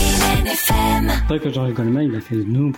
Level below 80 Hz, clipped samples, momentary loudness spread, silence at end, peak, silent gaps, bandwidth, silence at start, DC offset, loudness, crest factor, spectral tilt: -24 dBFS; under 0.1%; 5 LU; 0 s; -4 dBFS; none; 17.5 kHz; 0 s; under 0.1%; -18 LUFS; 14 dB; -4.5 dB/octave